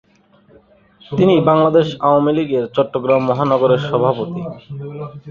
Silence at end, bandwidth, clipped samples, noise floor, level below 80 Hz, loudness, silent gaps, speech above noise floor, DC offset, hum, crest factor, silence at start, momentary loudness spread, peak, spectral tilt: 0 s; 7 kHz; under 0.1%; -52 dBFS; -54 dBFS; -15 LUFS; none; 36 dB; under 0.1%; none; 16 dB; 1.1 s; 17 LU; -2 dBFS; -8.5 dB/octave